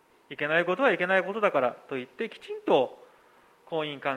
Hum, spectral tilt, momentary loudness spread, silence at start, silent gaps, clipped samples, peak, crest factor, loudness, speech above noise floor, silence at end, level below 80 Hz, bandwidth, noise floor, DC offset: none; -6 dB/octave; 12 LU; 0.3 s; none; under 0.1%; -8 dBFS; 20 dB; -27 LUFS; 32 dB; 0 s; -78 dBFS; 11.5 kHz; -59 dBFS; under 0.1%